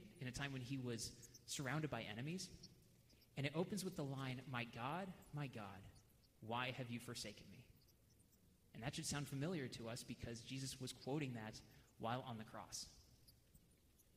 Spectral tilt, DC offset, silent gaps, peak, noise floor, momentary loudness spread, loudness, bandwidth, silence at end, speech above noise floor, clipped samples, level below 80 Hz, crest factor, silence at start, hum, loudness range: -4.5 dB/octave; under 0.1%; none; -30 dBFS; -73 dBFS; 15 LU; -49 LUFS; 15.5 kHz; 0.05 s; 25 dB; under 0.1%; -72 dBFS; 20 dB; 0 s; none; 3 LU